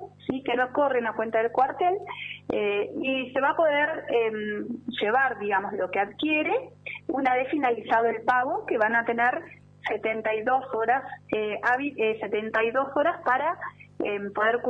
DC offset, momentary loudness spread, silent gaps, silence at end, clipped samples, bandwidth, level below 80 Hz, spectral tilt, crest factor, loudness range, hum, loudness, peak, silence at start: under 0.1%; 8 LU; none; 0 s; under 0.1%; 7.2 kHz; -68 dBFS; -6.5 dB/octave; 16 dB; 2 LU; 50 Hz at -55 dBFS; -26 LUFS; -10 dBFS; 0 s